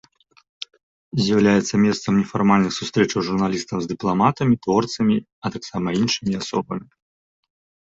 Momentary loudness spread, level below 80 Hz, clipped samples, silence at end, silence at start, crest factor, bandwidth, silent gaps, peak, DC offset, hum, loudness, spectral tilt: 12 LU; -54 dBFS; under 0.1%; 1.1 s; 1.15 s; 18 dB; 7.8 kHz; 5.32-5.42 s; -4 dBFS; under 0.1%; none; -20 LUFS; -5.5 dB/octave